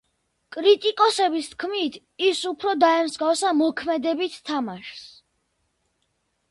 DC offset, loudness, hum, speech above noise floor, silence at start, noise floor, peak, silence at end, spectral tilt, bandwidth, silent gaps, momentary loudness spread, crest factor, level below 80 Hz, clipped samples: under 0.1%; -22 LUFS; none; 50 dB; 0.5 s; -72 dBFS; -6 dBFS; 1.45 s; -2.5 dB/octave; 11.5 kHz; none; 12 LU; 18 dB; -68 dBFS; under 0.1%